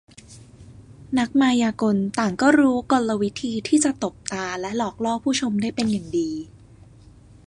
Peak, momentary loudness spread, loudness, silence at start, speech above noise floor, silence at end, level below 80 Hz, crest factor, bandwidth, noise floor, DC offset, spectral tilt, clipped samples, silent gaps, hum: -4 dBFS; 10 LU; -22 LUFS; 0.3 s; 27 dB; 1 s; -54 dBFS; 20 dB; 11 kHz; -48 dBFS; under 0.1%; -4.5 dB/octave; under 0.1%; none; none